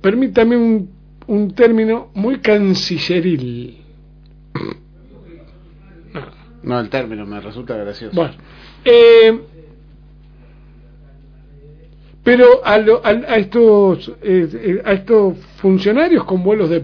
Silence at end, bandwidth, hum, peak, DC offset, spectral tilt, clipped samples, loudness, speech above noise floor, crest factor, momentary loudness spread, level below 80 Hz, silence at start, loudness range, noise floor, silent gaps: 0 s; 5.4 kHz; 50 Hz at -45 dBFS; 0 dBFS; under 0.1%; -7 dB/octave; under 0.1%; -13 LUFS; 29 dB; 14 dB; 20 LU; -44 dBFS; 0.05 s; 14 LU; -42 dBFS; none